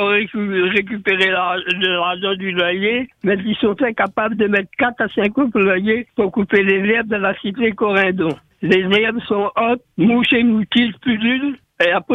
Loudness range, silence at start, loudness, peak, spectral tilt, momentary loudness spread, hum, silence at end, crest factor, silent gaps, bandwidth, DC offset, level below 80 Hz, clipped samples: 2 LU; 0 s; -17 LUFS; -2 dBFS; -7 dB/octave; 5 LU; none; 0 s; 16 dB; none; 8.4 kHz; under 0.1%; -54 dBFS; under 0.1%